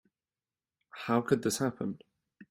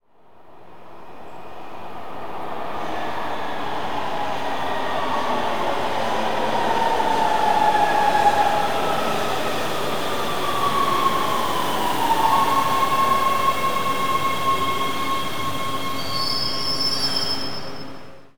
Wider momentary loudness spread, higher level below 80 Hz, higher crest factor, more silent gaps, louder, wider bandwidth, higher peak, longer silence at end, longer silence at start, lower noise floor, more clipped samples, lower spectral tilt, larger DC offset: first, 18 LU vs 14 LU; second, -70 dBFS vs -52 dBFS; first, 24 dB vs 18 dB; neither; second, -32 LUFS vs -22 LUFS; second, 16 kHz vs 19.5 kHz; second, -12 dBFS vs -4 dBFS; about the same, 0.1 s vs 0 s; first, 0.95 s vs 0 s; first, under -90 dBFS vs -49 dBFS; neither; first, -5 dB/octave vs -3.5 dB/octave; second, under 0.1% vs 5%